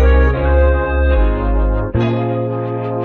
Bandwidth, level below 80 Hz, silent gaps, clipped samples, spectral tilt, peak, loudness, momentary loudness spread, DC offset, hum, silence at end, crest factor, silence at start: 4.2 kHz; -16 dBFS; none; under 0.1%; -10 dB/octave; -2 dBFS; -16 LUFS; 6 LU; under 0.1%; none; 0 s; 12 dB; 0 s